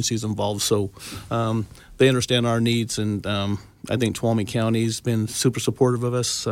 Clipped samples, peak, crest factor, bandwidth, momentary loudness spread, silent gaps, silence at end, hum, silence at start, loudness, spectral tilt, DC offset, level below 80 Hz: under 0.1%; -6 dBFS; 18 dB; 16.5 kHz; 8 LU; none; 0 s; none; 0 s; -23 LUFS; -5 dB/octave; under 0.1%; -50 dBFS